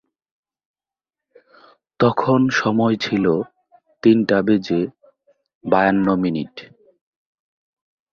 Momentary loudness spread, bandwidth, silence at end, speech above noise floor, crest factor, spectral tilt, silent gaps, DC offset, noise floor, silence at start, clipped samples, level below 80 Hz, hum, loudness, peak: 12 LU; 7 kHz; 1.45 s; 72 dB; 20 dB; -7 dB/octave; 5.55-5.61 s; under 0.1%; -90 dBFS; 2 s; under 0.1%; -56 dBFS; none; -18 LUFS; 0 dBFS